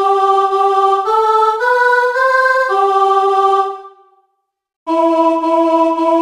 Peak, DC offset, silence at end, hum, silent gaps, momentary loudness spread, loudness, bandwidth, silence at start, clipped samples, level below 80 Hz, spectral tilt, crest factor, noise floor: -2 dBFS; under 0.1%; 0 s; none; 4.76-4.86 s; 4 LU; -12 LUFS; 13.5 kHz; 0 s; under 0.1%; -58 dBFS; -2.5 dB/octave; 12 dB; -66 dBFS